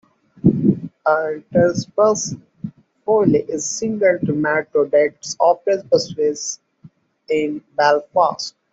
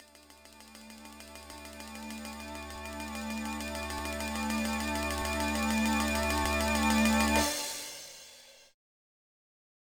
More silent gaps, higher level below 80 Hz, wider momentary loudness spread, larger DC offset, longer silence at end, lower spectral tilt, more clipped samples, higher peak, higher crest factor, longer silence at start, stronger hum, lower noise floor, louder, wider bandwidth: neither; second, -54 dBFS vs -44 dBFS; second, 11 LU vs 22 LU; neither; second, 0.25 s vs 1.35 s; first, -5 dB/octave vs -3.5 dB/octave; neither; first, -2 dBFS vs -12 dBFS; second, 16 dB vs 22 dB; first, 0.45 s vs 0 s; neither; second, -49 dBFS vs -56 dBFS; first, -18 LUFS vs -31 LUFS; second, 8 kHz vs 19.5 kHz